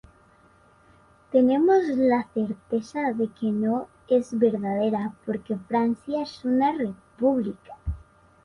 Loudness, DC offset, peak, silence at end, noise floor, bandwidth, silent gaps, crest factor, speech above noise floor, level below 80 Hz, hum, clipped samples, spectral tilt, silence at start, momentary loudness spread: -25 LUFS; under 0.1%; -8 dBFS; 0.45 s; -57 dBFS; 10.5 kHz; none; 16 dB; 33 dB; -48 dBFS; none; under 0.1%; -7.5 dB/octave; 1.3 s; 12 LU